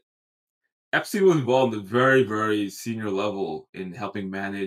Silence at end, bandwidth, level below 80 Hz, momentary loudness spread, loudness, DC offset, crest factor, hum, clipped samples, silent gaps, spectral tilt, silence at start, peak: 0 s; 15.5 kHz; -74 dBFS; 13 LU; -24 LUFS; under 0.1%; 18 dB; none; under 0.1%; 3.69-3.73 s; -5.5 dB/octave; 0.95 s; -8 dBFS